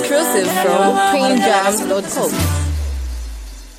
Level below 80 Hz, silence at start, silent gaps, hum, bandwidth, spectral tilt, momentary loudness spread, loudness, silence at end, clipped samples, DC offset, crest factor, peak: -28 dBFS; 0 s; none; none; 17 kHz; -4 dB/octave; 14 LU; -16 LUFS; 0 s; under 0.1%; under 0.1%; 14 dB; -2 dBFS